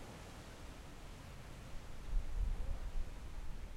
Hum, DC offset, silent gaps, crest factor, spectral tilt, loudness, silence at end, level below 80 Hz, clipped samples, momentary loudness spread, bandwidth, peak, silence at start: none; under 0.1%; none; 16 dB; -5.5 dB/octave; -49 LUFS; 0 s; -44 dBFS; under 0.1%; 10 LU; 13 kHz; -26 dBFS; 0 s